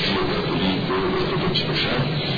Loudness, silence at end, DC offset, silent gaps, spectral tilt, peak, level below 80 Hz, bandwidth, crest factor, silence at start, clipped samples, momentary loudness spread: -22 LUFS; 0 s; under 0.1%; none; -7 dB/octave; -8 dBFS; -40 dBFS; 5 kHz; 12 dB; 0 s; under 0.1%; 1 LU